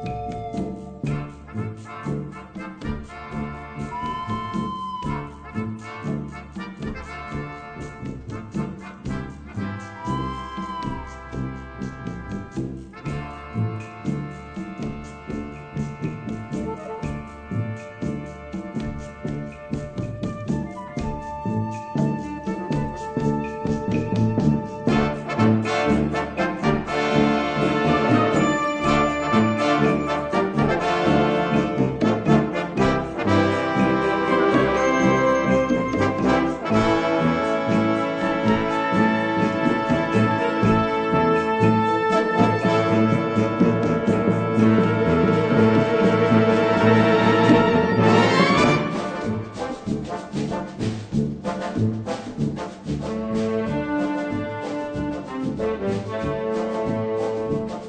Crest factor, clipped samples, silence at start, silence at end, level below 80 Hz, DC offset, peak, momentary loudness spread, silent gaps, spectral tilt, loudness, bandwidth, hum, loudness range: 18 dB; under 0.1%; 0 s; 0 s; -42 dBFS; under 0.1%; -4 dBFS; 14 LU; none; -7 dB/octave; -22 LUFS; 9.2 kHz; none; 13 LU